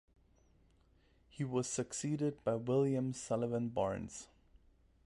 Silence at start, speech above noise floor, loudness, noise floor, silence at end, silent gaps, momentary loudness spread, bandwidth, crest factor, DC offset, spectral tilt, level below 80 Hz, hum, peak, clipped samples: 1.35 s; 33 dB; -37 LUFS; -69 dBFS; 0.8 s; none; 10 LU; 11.5 kHz; 16 dB; under 0.1%; -6 dB/octave; -66 dBFS; none; -22 dBFS; under 0.1%